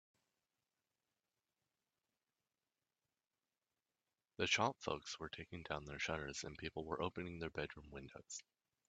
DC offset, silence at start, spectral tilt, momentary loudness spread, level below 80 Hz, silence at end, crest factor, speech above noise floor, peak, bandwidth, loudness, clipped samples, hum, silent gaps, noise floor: under 0.1%; 4.4 s; -3.5 dB/octave; 15 LU; -70 dBFS; 0.45 s; 26 dB; over 45 dB; -22 dBFS; 9 kHz; -44 LUFS; under 0.1%; none; none; under -90 dBFS